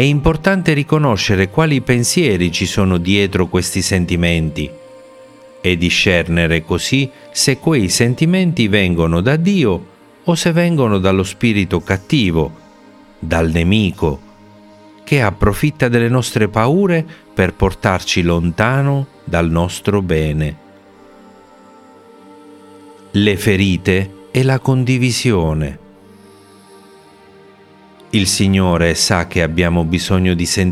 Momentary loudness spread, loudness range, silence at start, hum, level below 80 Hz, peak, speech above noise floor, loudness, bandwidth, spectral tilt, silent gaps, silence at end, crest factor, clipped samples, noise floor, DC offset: 6 LU; 6 LU; 0 s; none; -36 dBFS; 0 dBFS; 30 dB; -15 LUFS; 15.5 kHz; -5 dB/octave; none; 0 s; 16 dB; under 0.1%; -44 dBFS; under 0.1%